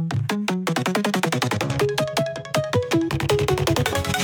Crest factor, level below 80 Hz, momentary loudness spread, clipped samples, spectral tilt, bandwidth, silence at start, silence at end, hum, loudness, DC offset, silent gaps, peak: 16 dB; -44 dBFS; 3 LU; under 0.1%; -5 dB/octave; 19.5 kHz; 0 s; 0 s; none; -22 LUFS; under 0.1%; none; -6 dBFS